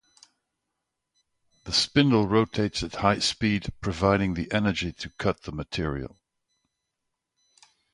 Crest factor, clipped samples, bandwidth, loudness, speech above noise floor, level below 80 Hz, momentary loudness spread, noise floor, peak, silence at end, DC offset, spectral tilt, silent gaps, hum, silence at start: 22 dB; under 0.1%; 11.5 kHz; -26 LUFS; 57 dB; -46 dBFS; 12 LU; -83 dBFS; -6 dBFS; 1.85 s; under 0.1%; -5 dB/octave; none; none; 1.65 s